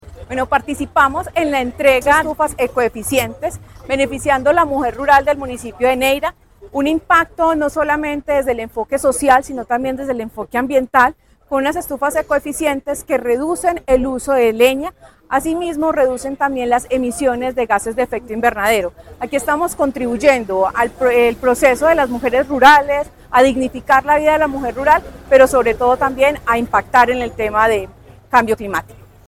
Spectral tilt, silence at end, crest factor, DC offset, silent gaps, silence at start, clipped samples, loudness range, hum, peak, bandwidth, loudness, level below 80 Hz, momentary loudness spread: -4 dB/octave; 0.35 s; 16 dB; 0.2%; none; 0.05 s; under 0.1%; 5 LU; none; 0 dBFS; 16.5 kHz; -16 LUFS; -40 dBFS; 9 LU